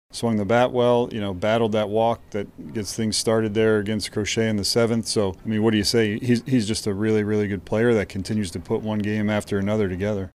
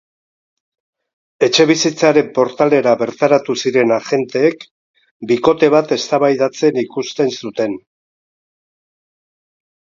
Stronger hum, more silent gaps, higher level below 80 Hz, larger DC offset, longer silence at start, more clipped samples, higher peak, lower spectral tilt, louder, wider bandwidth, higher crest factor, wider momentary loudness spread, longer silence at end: neither; second, none vs 4.71-4.94 s, 5.11-5.20 s; first, -50 dBFS vs -62 dBFS; neither; second, 0.15 s vs 1.4 s; neither; second, -6 dBFS vs 0 dBFS; about the same, -5 dB/octave vs -4.5 dB/octave; second, -22 LUFS vs -15 LUFS; first, 15 kHz vs 7.6 kHz; about the same, 16 dB vs 16 dB; about the same, 7 LU vs 9 LU; second, 0.05 s vs 2.1 s